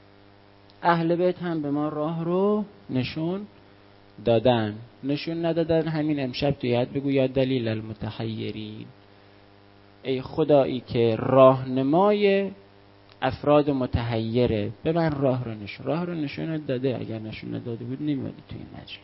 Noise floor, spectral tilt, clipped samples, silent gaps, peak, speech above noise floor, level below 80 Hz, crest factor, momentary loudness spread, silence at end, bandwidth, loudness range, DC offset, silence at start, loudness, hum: -53 dBFS; -11.5 dB/octave; under 0.1%; none; -2 dBFS; 29 dB; -50 dBFS; 22 dB; 13 LU; 0.05 s; 5.8 kHz; 7 LU; under 0.1%; 0.8 s; -25 LUFS; 50 Hz at -55 dBFS